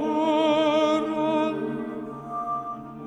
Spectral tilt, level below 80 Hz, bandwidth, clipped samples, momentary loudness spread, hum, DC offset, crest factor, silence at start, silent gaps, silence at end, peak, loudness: -5.5 dB/octave; -62 dBFS; 8.6 kHz; under 0.1%; 13 LU; none; under 0.1%; 14 dB; 0 s; none; 0 s; -10 dBFS; -25 LUFS